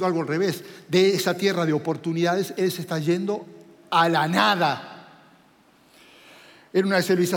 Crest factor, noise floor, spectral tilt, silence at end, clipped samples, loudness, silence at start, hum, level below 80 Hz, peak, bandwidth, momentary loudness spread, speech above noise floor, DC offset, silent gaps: 20 dB; -57 dBFS; -5 dB/octave; 0 s; under 0.1%; -23 LUFS; 0 s; none; -78 dBFS; -4 dBFS; 17 kHz; 7 LU; 35 dB; under 0.1%; none